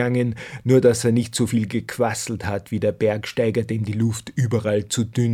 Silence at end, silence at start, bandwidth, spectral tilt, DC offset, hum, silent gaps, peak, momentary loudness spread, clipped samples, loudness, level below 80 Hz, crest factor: 0 s; 0 s; 15 kHz; -6 dB/octave; under 0.1%; none; none; -4 dBFS; 9 LU; under 0.1%; -22 LUFS; -52 dBFS; 16 dB